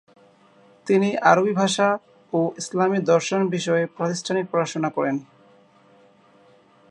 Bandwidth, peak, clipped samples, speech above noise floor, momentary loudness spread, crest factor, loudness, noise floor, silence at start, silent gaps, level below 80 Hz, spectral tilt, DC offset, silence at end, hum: 11 kHz; -2 dBFS; under 0.1%; 34 dB; 9 LU; 22 dB; -22 LUFS; -55 dBFS; 0.85 s; none; -72 dBFS; -5 dB/octave; under 0.1%; 1.7 s; none